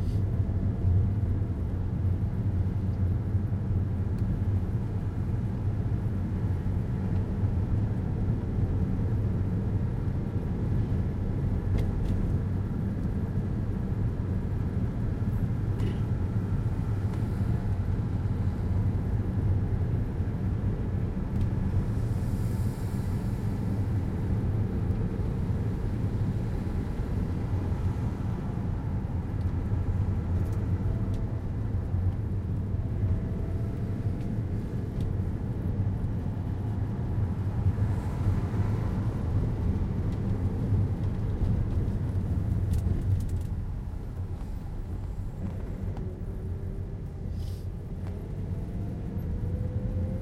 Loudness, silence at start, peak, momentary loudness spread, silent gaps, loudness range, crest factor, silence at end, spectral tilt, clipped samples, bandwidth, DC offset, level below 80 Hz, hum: -30 LUFS; 0 s; -14 dBFS; 6 LU; none; 3 LU; 14 dB; 0 s; -9.5 dB/octave; under 0.1%; 6.2 kHz; under 0.1%; -36 dBFS; none